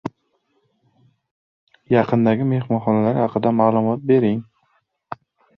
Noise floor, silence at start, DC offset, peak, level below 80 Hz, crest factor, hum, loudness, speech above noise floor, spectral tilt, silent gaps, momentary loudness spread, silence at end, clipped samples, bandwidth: -68 dBFS; 0.05 s; under 0.1%; -2 dBFS; -60 dBFS; 18 dB; none; -19 LUFS; 50 dB; -10.5 dB/octave; 1.31-1.67 s; 19 LU; 0.45 s; under 0.1%; 5.6 kHz